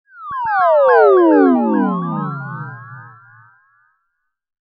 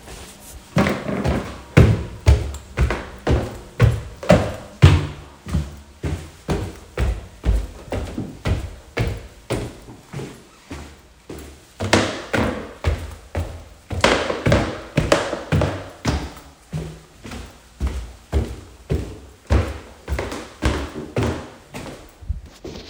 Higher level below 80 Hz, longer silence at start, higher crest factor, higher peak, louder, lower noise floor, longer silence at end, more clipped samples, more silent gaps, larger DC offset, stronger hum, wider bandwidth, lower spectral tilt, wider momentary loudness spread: second, -68 dBFS vs -30 dBFS; first, 0.2 s vs 0.05 s; second, 16 dB vs 22 dB; about the same, 0 dBFS vs 0 dBFS; first, -13 LUFS vs -22 LUFS; first, -72 dBFS vs -42 dBFS; first, 1.55 s vs 0 s; neither; neither; neither; neither; second, 5.2 kHz vs 18.5 kHz; first, -11 dB/octave vs -6 dB/octave; about the same, 19 LU vs 20 LU